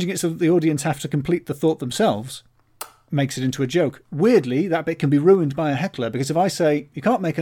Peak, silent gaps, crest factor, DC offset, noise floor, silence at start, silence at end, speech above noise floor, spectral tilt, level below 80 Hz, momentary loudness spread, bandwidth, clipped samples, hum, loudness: -4 dBFS; none; 16 dB; under 0.1%; -40 dBFS; 0 s; 0 s; 20 dB; -6 dB/octave; -58 dBFS; 8 LU; 18.5 kHz; under 0.1%; none; -21 LUFS